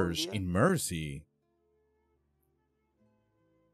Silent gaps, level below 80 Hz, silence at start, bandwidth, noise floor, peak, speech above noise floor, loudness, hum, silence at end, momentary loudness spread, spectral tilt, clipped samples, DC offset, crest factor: none; -58 dBFS; 0 s; 15 kHz; -76 dBFS; -12 dBFS; 45 dB; -31 LUFS; none; 2.5 s; 14 LU; -4.5 dB/octave; under 0.1%; under 0.1%; 22 dB